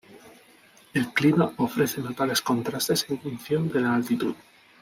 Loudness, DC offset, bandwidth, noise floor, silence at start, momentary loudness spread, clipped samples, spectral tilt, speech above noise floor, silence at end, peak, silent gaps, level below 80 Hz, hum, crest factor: -25 LUFS; under 0.1%; 16.5 kHz; -55 dBFS; 0.1 s; 9 LU; under 0.1%; -5 dB/octave; 30 dB; 0.45 s; -8 dBFS; none; -64 dBFS; none; 18 dB